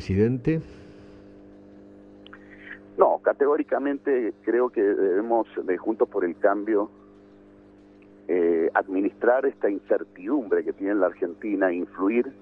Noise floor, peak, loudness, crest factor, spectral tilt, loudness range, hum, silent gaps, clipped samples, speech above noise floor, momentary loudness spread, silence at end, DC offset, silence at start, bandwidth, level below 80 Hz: -51 dBFS; -4 dBFS; -24 LUFS; 22 dB; -9.5 dB/octave; 4 LU; 50 Hz at -55 dBFS; none; under 0.1%; 27 dB; 6 LU; 0.1 s; under 0.1%; 0 s; 6.2 kHz; -58 dBFS